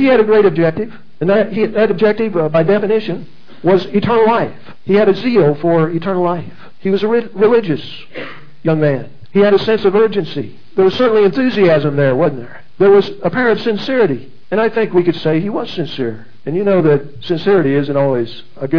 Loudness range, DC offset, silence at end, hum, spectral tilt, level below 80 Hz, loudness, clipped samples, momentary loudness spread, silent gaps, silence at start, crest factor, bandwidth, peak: 3 LU; 4%; 0 s; none; -8.5 dB/octave; -54 dBFS; -14 LUFS; under 0.1%; 12 LU; none; 0 s; 14 dB; 5.4 kHz; 0 dBFS